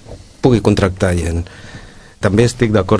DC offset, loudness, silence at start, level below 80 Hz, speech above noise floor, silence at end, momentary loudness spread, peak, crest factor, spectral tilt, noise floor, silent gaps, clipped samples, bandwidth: under 0.1%; -15 LUFS; 0.1 s; -32 dBFS; 23 dB; 0 s; 17 LU; 0 dBFS; 16 dB; -6.5 dB/octave; -36 dBFS; none; under 0.1%; 11 kHz